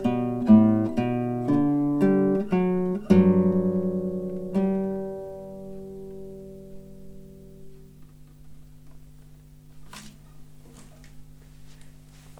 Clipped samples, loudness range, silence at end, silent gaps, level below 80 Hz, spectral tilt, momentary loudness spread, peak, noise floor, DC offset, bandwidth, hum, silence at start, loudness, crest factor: under 0.1%; 22 LU; 0.1 s; none; -52 dBFS; -9.5 dB/octave; 24 LU; -6 dBFS; -48 dBFS; under 0.1%; 9.8 kHz; 50 Hz at -50 dBFS; 0 s; -23 LUFS; 20 dB